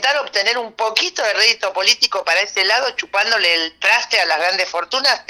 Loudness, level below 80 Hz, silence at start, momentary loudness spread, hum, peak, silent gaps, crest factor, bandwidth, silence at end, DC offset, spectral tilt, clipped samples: -15 LUFS; -64 dBFS; 0 s; 5 LU; none; 0 dBFS; none; 18 dB; 19.5 kHz; 0.1 s; under 0.1%; 1.5 dB/octave; under 0.1%